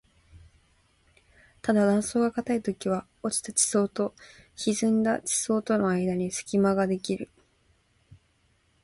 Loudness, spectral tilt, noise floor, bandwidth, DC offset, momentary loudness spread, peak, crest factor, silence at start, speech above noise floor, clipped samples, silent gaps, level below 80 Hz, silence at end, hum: -26 LUFS; -4.5 dB/octave; -67 dBFS; 11.5 kHz; under 0.1%; 9 LU; -10 dBFS; 18 dB; 0.35 s; 41 dB; under 0.1%; none; -62 dBFS; 0.7 s; none